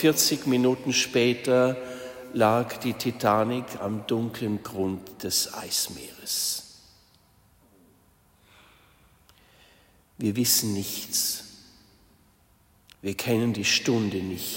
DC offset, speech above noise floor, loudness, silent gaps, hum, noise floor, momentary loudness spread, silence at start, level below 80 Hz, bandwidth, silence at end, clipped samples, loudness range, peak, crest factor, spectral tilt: under 0.1%; 36 dB; -25 LUFS; none; none; -61 dBFS; 12 LU; 0 s; -64 dBFS; 16.5 kHz; 0 s; under 0.1%; 8 LU; -6 dBFS; 22 dB; -3.5 dB/octave